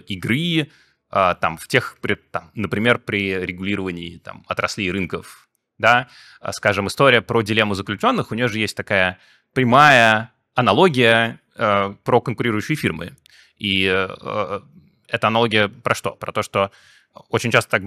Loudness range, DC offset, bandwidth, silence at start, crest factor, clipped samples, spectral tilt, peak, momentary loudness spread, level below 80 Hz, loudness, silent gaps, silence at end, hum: 7 LU; under 0.1%; 17.5 kHz; 0.1 s; 20 dB; under 0.1%; -5 dB/octave; 0 dBFS; 12 LU; -56 dBFS; -19 LUFS; none; 0 s; none